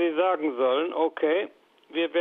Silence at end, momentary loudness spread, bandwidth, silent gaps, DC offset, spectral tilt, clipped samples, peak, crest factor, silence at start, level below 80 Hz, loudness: 0 s; 7 LU; 4 kHz; none; under 0.1%; -6.5 dB/octave; under 0.1%; -12 dBFS; 14 dB; 0 s; -82 dBFS; -26 LUFS